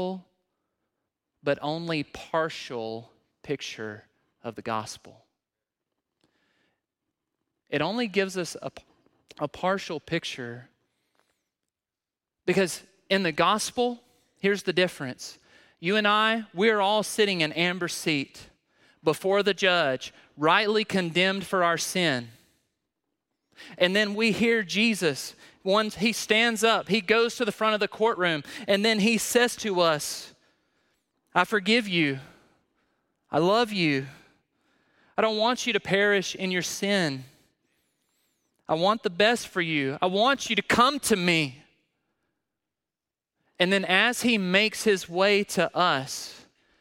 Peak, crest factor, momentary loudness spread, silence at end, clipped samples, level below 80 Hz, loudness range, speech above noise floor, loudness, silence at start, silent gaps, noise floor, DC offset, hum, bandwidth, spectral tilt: -4 dBFS; 24 dB; 13 LU; 0.4 s; under 0.1%; -66 dBFS; 10 LU; over 65 dB; -25 LUFS; 0 s; none; under -90 dBFS; under 0.1%; none; 16.5 kHz; -3.5 dB/octave